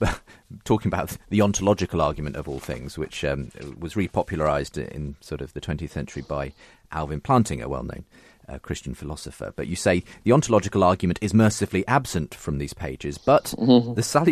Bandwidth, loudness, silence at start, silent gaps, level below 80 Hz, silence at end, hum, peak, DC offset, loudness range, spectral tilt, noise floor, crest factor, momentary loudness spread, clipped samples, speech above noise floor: 14 kHz; -24 LUFS; 0 s; none; -42 dBFS; 0 s; none; -4 dBFS; under 0.1%; 7 LU; -6 dB/octave; -45 dBFS; 20 dB; 15 LU; under 0.1%; 21 dB